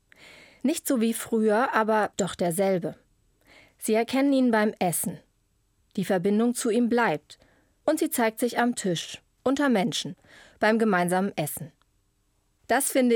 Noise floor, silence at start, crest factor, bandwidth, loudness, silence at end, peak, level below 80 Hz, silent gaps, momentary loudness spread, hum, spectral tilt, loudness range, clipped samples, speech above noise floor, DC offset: -70 dBFS; 0.65 s; 18 dB; over 20 kHz; -25 LUFS; 0 s; -8 dBFS; -68 dBFS; none; 10 LU; none; -4.5 dB/octave; 2 LU; under 0.1%; 45 dB; under 0.1%